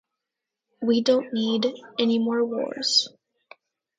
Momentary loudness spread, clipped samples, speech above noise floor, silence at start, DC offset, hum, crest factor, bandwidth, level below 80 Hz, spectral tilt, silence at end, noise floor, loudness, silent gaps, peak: 6 LU; under 0.1%; 62 dB; 0.8 s; under 0.1%; none; 18 dB; 9.4 kHz; -76 dBFS; -3.5 dB/octave; 0.9 s; -86 dBFS; -23 LUFS; none; -8 dBFS